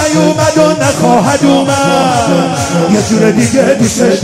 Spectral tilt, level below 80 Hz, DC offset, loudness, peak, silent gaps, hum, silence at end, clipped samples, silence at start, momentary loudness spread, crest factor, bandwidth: -5 dB/octave; -40 dBFS; under 0.1%; -9 LUFS; 0 dBFS; none; none; 0 s; 0.3%; 0 s; 2 LU; 8 dB; 16 kHz